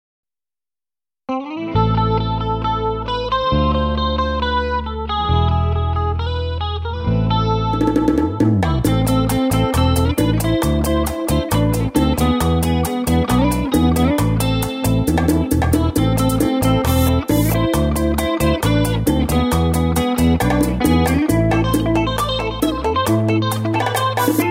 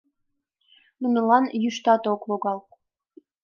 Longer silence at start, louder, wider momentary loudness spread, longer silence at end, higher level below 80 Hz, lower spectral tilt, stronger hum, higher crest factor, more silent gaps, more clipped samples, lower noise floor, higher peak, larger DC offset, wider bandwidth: first, 1.3 s vs 1 s; first, -17 LUFS vs -23 LUFS; second, 4 LU vs 10 LU; second, 0 s vs 0.85 s; first, -26 dBFS vs -80 dBFS; about the same, -6 dB/octave vs -5.5 dB/octave; neither; second, 14 dB vs 20 dB; neither; neither; first, under -90 dBFS vs -77 dBFS; about the same, -2 dBFS vs -4 dBFS; neither; first, 16.5 kHz vs 7.2 kHz